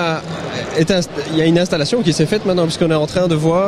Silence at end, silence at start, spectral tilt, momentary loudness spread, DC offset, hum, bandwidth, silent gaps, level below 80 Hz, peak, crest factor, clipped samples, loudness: 0 s; 0 s; -5.5 dB/octave; 6 LU; under 0.1%; none; 13 kHz; none; -44 dBFS; -2 dBFS; 14 dB; under 0.1%; -16 LUFS